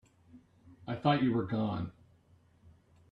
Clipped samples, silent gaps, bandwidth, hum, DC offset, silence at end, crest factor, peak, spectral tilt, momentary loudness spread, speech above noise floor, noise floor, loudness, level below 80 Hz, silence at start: under 0.1%; none; 5.4 kHz; none; under 0.1%; 1.2 s; 22 dB; -14 dBFS; -9 dB/octave; 15 LU; 34 dB; -65 dBFS; -33 LUFS; -66 dBFS; 0.35 s